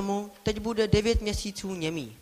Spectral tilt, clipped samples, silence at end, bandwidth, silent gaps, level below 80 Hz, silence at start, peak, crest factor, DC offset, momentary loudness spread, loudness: -5 dB/octave; under 0.1%; 0.05 s; 15.5 kHz; none; -38 dBFS; 0 s; -8 dBFS; 20 dB; under 0.1%; 8 LU; -29 LUFS